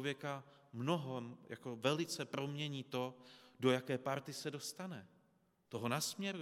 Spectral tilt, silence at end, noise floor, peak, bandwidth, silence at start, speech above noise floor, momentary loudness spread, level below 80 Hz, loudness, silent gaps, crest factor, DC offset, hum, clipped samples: -4.5 dB/octave; 0 s; -76 dBFS; -20 dBFS; 16.5 kHz; 0 s; 35 dB; 13 LU; -88 dBFS; -41 LUFS; none; 22 dB; under 0.1%; none; under 0.1%